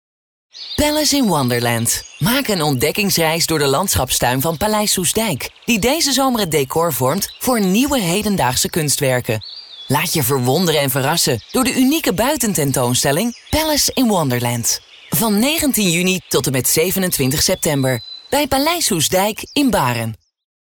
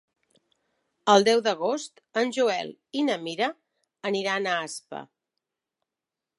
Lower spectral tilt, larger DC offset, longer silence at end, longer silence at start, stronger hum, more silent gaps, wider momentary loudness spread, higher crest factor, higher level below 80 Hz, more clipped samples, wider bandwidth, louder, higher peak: about the same, -3.5 dB/octave vs -3.5 dB/octave; neither; second, 0.5 s vs 1.35 s; second, 0.55 s vs 1.05 s; neither; neither; second, 5 LU vs 15 LU; second, 12 dB vs 24 dB; first, -40 dBFS vs -82 dBFS; neither; first, over 20 kHz vs 11.5 kHz; first, -16 LUFS vs -26 LUFS; about the same, -4 dBFS vs -4 dBFS